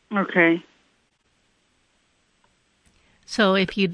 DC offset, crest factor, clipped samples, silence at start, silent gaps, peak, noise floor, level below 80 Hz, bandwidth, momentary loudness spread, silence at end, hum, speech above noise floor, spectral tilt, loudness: under 0.1%; 22 dB; under 0.1%; 0.1 s; none; -4 dBFS; -67 dBFS; -60 dBFS; 10.5 kHz; 9 LU; 0 s; none; 47 dB; -5.5 dB/octave; -20 LUFS